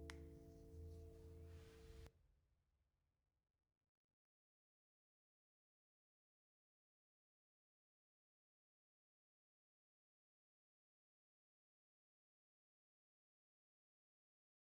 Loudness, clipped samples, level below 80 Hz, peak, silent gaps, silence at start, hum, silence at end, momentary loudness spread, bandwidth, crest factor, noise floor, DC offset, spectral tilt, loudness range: -62 LUFS; under 0.1%; -72 dBFS; -34 dBFS; none; 0 s; none; 11.75 s; 5 LU; over 20 kHz; 34 dB; -88 dBFS; under 0.1%; -6 dB/octave; 5 LU